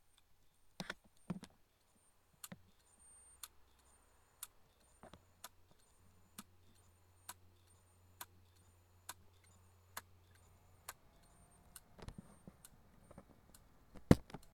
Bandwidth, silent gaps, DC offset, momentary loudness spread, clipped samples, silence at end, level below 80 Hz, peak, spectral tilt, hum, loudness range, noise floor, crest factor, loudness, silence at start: 17.5 kHz; none; under 0.1%; 18 LU; under 0.1%; 0.1 s; -60 dBFS; -8 dBFS; -6 dB/octave; none; 6 LU; -73 dBFS; 40 dB; -45 LUFS; 0.8 s